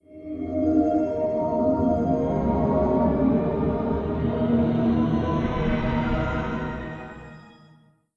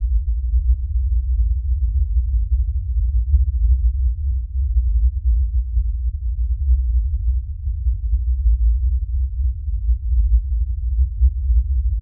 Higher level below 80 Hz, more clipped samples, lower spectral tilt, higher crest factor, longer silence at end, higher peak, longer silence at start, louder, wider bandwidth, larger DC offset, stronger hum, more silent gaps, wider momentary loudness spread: second, -36 dBFS vs -18 dBFS; neither; second, -9.5 dB/octave vs -17 dB/octave; about the same, 14 dB vs 12 dB; first, 0.65 s vs 0 s; second, -10 dBFS vs -4 dBFS; about the same, 0.1 s vs 0 s; second, -24 LUFS vs -21 LUFS; first, 6.8 kHz vs 0.2 kHz; neither; neither; neither; first, 10 LU vs 5 LU